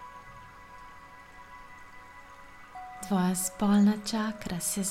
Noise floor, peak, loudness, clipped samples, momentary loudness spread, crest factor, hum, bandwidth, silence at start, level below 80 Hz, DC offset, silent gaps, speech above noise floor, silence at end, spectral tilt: -50 dBFS; -16 dBFS; -28 LUFS; under 0.1%; 25 LU; 16 dB; none; 16.5 kHz; 0 s; -58 dBFS; under 0.1%; none; 22 dB; 0 s; -4.5 dB/octave